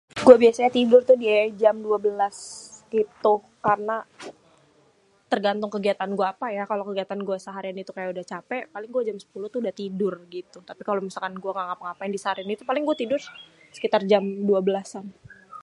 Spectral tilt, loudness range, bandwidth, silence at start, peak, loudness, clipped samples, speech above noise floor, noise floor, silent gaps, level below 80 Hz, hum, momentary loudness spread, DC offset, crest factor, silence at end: -5.5 dB/octave; 9 LU; 11 kHz; 0.15 s; 0 dBFS; -23 LUFS; under 0.1%; 38 dB; -61 dBFS; none; -68 dBFS; none; 19 LU; under 0.1%; 24 dB; 0.05 s